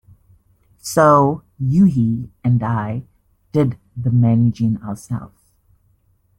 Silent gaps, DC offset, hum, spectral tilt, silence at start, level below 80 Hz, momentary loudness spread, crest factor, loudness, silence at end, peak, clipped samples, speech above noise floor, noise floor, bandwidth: none; under 0.1%; none; -8 dB/octave; 0.85 s; -50 dBFS; 14 LU; 16 dB; -18 LUFS; 1.1 s; -2 dBFS; under 0.1%; 43 dB; -59 dBFS; 13 kHz